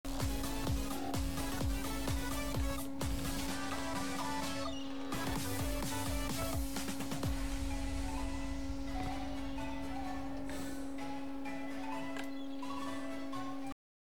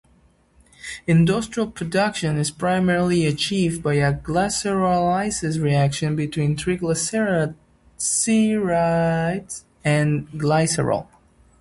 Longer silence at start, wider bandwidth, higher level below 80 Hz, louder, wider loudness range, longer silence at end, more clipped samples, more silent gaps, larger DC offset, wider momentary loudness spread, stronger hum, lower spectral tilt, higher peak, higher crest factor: second, 0.05 s vs 0.85 s; first, 19 kHz vs 11.5 kHz; about the same, -44 dBFS vs -48 dBFS; second, -40 LUFS vs -21 LUFS; first, 4 LU vs 1 LU; second, 0.45 s vs 0.6 s; neither; neither; first, 0.8% vs under 0.1%; about the same, 5 LU vs 7 LU; neither; about the same, -4.5 dB/octave vs -5 dB/octave; second, -24 dBFS vs -6 dBFS; about the same, 14 dB vs 14 dB